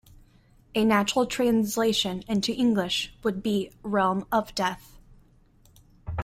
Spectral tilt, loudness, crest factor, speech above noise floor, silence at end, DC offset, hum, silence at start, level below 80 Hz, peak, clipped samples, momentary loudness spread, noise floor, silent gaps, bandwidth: -4.5 dB/octave; -26 LUFS; 18 dB; 33 dB; 0 s; under 0.1%; none; 0.75 s; -50 dBFS; -8 dBFS; under 0.1%; 7 LU; -58 dBFS; none; 16 kHz